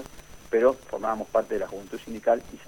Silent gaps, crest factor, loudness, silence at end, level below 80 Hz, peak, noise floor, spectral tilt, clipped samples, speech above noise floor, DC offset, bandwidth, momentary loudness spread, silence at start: none; 18 dB; -27 LUFS; 0.05 s; -54 dBFS; -8 dBFS; -46 dBFS; -5 dB/octave; under 0.1%; 19 dB; 0.2%; 18.5 kHz; 14 LU; 0 s